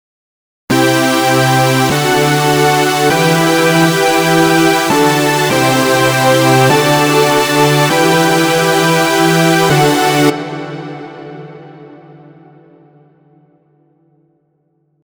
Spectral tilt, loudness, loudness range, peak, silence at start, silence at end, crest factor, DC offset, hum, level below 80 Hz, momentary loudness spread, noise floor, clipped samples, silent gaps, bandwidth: -4.5 dB/octave; -10 LUFS; 6 LU; 0 dBFS; 0.7 s; 3.2 s; 12 dB; under 0.1%; none; -48 dBFS; 7 LU; -60 dBFS; under 0.1%; none; over 20 kHz